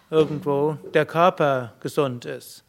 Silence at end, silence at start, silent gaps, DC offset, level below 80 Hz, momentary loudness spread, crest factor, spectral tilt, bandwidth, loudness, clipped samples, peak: 0.1 s; 0.1 s; none; under 0.1%; -66 dBFS; 9 LU; 20 dB; -6.5 dB/octave; 16 kHz; -22 LUFS; under 0.1%; -2 dBFS